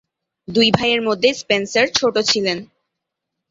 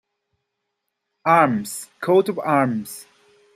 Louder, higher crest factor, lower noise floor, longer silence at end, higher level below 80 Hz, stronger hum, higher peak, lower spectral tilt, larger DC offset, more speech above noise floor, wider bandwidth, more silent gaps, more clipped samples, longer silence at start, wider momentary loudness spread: first, -17 LUFS vs -20 LUFS; about the same, 18 dB vs 20 dB; about the same, -80 dBFS vs -78 dBFS; first, 0.85 s vs 0.55 s; first, -54 dBFS vs -70 dBFS; neither; about the same, 0 dBFS vs -2 dBFS; second, -3.5 dB/octave vs -5.5 dB/octave; neither; first, 63 dB vs 59 dB; second, 8 kHz vs 16 kHz; neither; neither; second, 0.5 s vs 1.25 s; second, 7 LU vs 15 LU